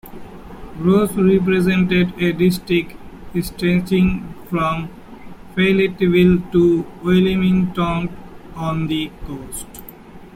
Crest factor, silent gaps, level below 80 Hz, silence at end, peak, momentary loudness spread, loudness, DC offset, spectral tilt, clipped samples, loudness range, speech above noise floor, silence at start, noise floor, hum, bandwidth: 16 dB; none; -38 dBFS; 0.05 s; -2 dBFS; 18 LU; -18 LUFS; under 0.1%; -7 dB/octave; under 0.1%; 4 LU; 22 dB; 0.05 s; -39 dBFS; none; 16 kHz